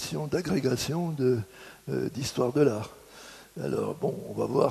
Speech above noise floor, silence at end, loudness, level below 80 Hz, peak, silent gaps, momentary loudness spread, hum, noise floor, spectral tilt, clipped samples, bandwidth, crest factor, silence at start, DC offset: 21 dB; 0 s; -29 LUFS; -60 dBFS; -10 dBFS; none; 18 LU; none; -49 dBFS; -6 dB/octave; under 0.1%; 13.5 kHz; 20 dB; 0 s; under 0.1%